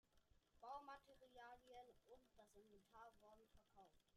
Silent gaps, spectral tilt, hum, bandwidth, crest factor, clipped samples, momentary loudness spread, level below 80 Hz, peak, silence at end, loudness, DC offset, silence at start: none; -4 dB/octave; none; 12 kHz; 20 dB; under 0.1%; 9 LU; -82 dBFS; -46 dBFS; 0 s; -63 LUFS; under 0.1%; 0.05 s